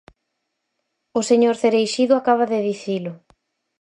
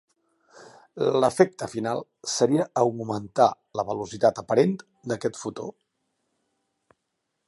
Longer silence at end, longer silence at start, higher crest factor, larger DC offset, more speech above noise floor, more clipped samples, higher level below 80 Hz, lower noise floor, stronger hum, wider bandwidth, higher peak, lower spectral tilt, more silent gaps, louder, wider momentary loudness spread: second, 0.65 s vs 1.75 s; first, 1.15 s vs 0.6 s; second, 16 dB vs 22 dB; neither; about the same, 58 dB vs 55 dB; neither; about the same, -66 dBFS vs -66 dBFS; about the same, -76 dBFS vs -79 dBFS; neither; about the same, 11 kHz vs 11.5 kHz; about the same, -4 dBFS vs -4 dBFS; about the same, -4.5 dB/octave vs -5 dB/octave; neither; first, -19 LUFS vs -25 LUFS; about the same, 10 LU vs 12 LU